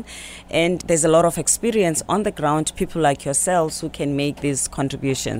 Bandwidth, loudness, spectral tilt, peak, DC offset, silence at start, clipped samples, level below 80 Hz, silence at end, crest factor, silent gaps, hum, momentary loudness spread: 16.5 kHz; -20 LUFS; -4 dB/octave; -4 dBFS; under 0.1%; 0 s; under 0.1%; -44 dBFS; 0 s; 16 dB; none; none; 8 LU